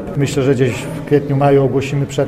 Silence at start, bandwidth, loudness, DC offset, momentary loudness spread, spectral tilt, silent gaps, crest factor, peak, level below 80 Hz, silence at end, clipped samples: 0 s; 14 kHz; -15 LUFS; under 0.1%; 6 LU; -7 dB/octave; none; 14 dB; -2 dBFS; -42 dBFS; 0 s; under 0.1%